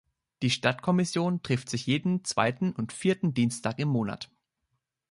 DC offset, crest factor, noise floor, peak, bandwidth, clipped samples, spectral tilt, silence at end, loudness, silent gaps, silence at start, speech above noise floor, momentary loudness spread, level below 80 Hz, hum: under 0.1%; 20 dB; -80 dBFS; -8 dBFS; 11.5 kHz; under 0.1%; -5.5 dB/octave; 0.85 s; -28 LUFS; none; 0.4 s; 53 dB; 5 LU; -64 dBFS; none